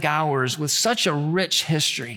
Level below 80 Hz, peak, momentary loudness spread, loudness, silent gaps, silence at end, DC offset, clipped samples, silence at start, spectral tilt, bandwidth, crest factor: -68 dBFS; -6 dBFS; 3 LU; -21 LUFS; none; 0 s; under 0.1%; under 0.1%; 0 s; -3 dB/octave; 19 kHz; 16 dB